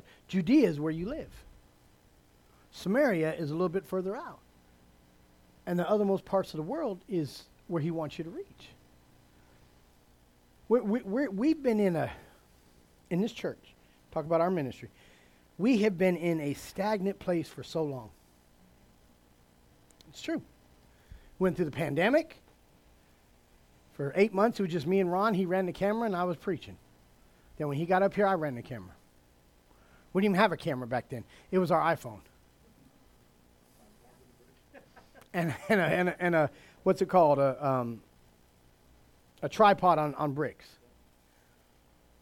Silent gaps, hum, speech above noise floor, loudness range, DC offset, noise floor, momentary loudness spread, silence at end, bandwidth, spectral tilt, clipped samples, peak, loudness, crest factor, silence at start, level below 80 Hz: none; none; 34 dB; 8 LU; under 0.1%; -64 dBFS; 15 LU; 1.7 s; 16.5 kHz; -7 dB/octave; under 0.1%; -10 dBFS; -30 LUFS; 22 dB; 0.3 s; -62 dBFS